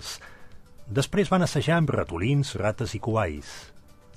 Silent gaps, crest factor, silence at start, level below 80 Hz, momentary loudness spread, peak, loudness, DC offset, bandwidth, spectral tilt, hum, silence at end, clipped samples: none; 18 dB; 0 s; -46 dBFS; 15 LU; -8 dBFS; -26 LUFS; under 0.1%; 14.5 kHz; -6 dB/octave; none; 0.05 s; under 0.1%